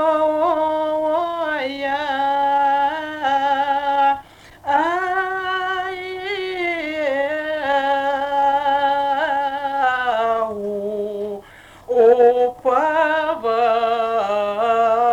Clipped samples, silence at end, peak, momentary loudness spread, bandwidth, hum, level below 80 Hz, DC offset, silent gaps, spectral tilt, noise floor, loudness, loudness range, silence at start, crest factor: under 0.1%; 0 s; -4 dBFS; 8 LU; 14 kHz; none; -56 dBFS; under 0.1%; none; -4.5 dB/octave; -43 dBFS; -19 LUFS; 4 LU; 0 s; 14 dB